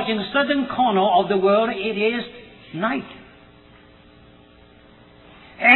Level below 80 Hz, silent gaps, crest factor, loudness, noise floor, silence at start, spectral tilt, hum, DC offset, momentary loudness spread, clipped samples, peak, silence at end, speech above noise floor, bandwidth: -56 dBFS; none; 22 dB; -20 LUFS; -49 dBFS; 0 s; -8.5 dB/octave; none; under 0.1%; 17 LU; under 0.1%; 0 dBFS; 0 s; 29 dB; 4.3 kHz